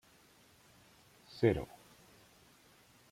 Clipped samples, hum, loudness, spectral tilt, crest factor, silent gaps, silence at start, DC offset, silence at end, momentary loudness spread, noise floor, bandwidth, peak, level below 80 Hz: under 0.1%; none; -35 LUFS; -7.5 dB/octave; 26 dB; none; 1.35 s; under 0.1%; 1.45 s; 28 LU; -65 dBFS; 16 kHz; -16 dBFS; -62 dBFS